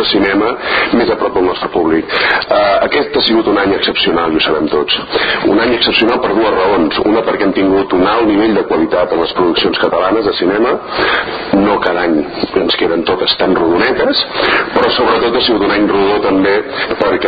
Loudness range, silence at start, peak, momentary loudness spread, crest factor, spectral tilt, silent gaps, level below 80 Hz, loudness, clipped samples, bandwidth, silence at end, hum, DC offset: 1 LU; 0 s; 0 dBFS; 3 LU; 12 dB; -7.5 dB/octave; none; -40 dBFS; -12 LUFS; under 0.1%; 5 kHz; 0 s; none; under 0.1%